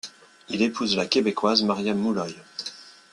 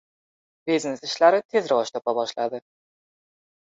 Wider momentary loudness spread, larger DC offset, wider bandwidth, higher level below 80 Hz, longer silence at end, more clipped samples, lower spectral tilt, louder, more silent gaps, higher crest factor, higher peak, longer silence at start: first, 14 LU vs 11 LU; neither; first, 11.5 kHz vs 8 kHz; first, -64 dBFS vs -74 dBFS; second, 0.2 s vs 1.2 s; neither; about the same, -4.5 dB/octave vs -3.5 dB/octave; about the same, -24 LUFS vs -23 LUFS; second, none vs 1.45-1.49 s; about the same, 22 dB vs 20 dB; first, -2 dBFS vs -6 dBFS; second, 0.05 s vs 0.65 s